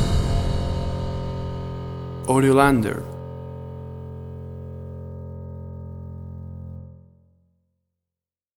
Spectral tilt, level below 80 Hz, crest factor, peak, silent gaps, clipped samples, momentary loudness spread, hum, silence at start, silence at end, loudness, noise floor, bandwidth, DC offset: -6.5 dB/octave; -34 dBFS; 24 dB; -2 dBFS; none; under 0.1%; 19 LU; none; 0 s; 1.55 s; -25 LUFS; -90 dBFS; 16 kHz; under 0.1%